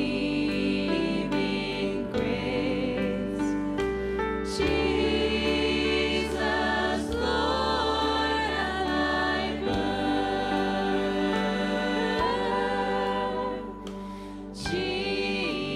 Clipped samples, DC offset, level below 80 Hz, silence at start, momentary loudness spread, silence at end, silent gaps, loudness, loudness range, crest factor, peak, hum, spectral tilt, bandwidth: under 0.1%; under 0.1%; -42 dBFS; 0 s; 4 LU; 0 s; none; -27 LUFS; 3 LU; 14 dB; -12 dBFS; none; -5 dB/octave; 12.5 kHz